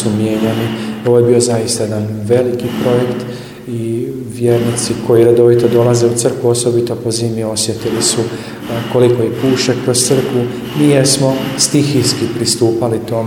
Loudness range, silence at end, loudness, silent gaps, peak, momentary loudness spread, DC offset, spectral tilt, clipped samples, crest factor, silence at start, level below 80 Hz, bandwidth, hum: 3 LU; 0 s; -13 LUFS; none; 0 dBFS; 9 LU; under 0.1%; -5 dB/octave; under 0.1%; 14 dB; 0 s; -48 dBFS; 16.5 kHz; none